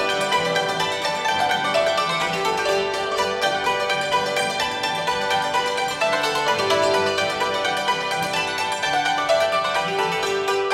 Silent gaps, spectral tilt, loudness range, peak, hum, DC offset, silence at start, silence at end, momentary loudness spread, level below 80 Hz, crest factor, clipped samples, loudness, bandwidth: none; -2.5 dB/octave; 1 LU; -6 dBFS; none; under 0.1%; 0 s; 0 s; 3 LU; -56 dBFS; 16 dB; under 0.1%; -21 LUFS; 16.5 kHz